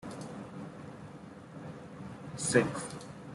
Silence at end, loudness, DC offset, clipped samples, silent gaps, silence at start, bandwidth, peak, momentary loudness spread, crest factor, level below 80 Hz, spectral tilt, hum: 0 s; -36 LUFS; under 0.1%; under 0.1%; none; 0 s; 12 kHz; -10 dBFS; 19 LU; 26 dB; -66 dBFS; -4.5 dB/octave; none